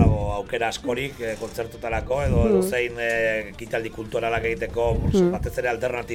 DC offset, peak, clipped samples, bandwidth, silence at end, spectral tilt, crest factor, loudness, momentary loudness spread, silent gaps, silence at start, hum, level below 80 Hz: under 0.1%; -6 dBFS; under 0.1%; 17.5 kHz; 0 s; -6 dB/octave; 18 dB; -24 LUFS; 9 LU; none; 0 s; none; -34 dBFS